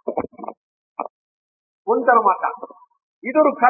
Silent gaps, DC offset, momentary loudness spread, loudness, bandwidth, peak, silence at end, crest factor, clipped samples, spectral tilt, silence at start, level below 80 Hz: 0.57-0.96 s, 1.10-1.85 s, 3.03-3.22 s; under 0.1%; 21 LU; -19 LUFS; 2.7 kHz; 0 dBFS; 0 s; 22 dB; under 0.1%; -11 dB/octave; 0.05 s; -66 dBFS